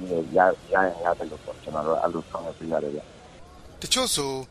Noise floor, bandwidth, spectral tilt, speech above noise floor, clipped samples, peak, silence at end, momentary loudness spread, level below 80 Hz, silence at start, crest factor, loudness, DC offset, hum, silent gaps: -46 dBFS; 15.5 kHz; -3 dB/octave; 20 dB; under 0.1%; -6 dBFS; 0.05 s; 14 LU; -52 dBFS; 0 s; 22 dB; -25 LUFS; under 0.1%; none; none